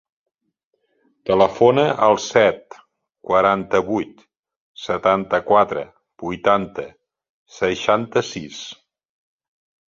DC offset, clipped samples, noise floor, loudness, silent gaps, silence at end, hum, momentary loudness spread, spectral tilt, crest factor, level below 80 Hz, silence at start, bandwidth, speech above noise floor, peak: under 0.1%; under 0.1%; -72 dBFS; -18 LUFS; 4.39-4.43 s, 4.57-4.75 s, 7.30-7.46 s; 1.15 s; none; 18 LU; -5 dB/octave; 20 dB; -56 dBFS; 1.25 s; 7.6 kHz; 54 dB; -2 dBFS